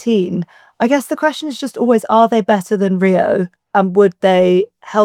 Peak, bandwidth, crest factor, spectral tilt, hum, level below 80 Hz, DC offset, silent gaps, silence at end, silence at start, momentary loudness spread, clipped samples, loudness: 0 dBFS; 15 kHz; 14 dB; -6.5 dB/octave; none; -66 dBFS; under 0.1%; none; 0 s; 0 s; 8 LU; under 0.1%; -15 LUFS